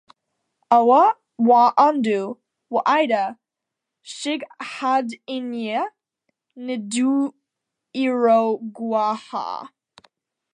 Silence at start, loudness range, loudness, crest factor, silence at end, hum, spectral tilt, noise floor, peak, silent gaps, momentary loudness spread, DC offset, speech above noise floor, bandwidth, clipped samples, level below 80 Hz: 0.7 s; 9 LU; -20 LUFS; 20 dB; 0.85 s; none; -4.5 dB/octave; -84 dBFS; -2 dBFS; none; 16 LU; under 0.1%; 64 dB; 10.5 kHz; under 0.1%; -80 dBFS